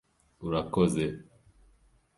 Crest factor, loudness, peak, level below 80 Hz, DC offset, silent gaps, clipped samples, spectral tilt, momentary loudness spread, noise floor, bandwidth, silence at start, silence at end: 20 dB; -30 LUFS; -12 dBFS; -54 dBFS; under 0.1%; none; under 0.1%; -6.5 dB/octave; 15 LU; -64 dBFS; 11.5 kHz; 0.4 s; 0.95 s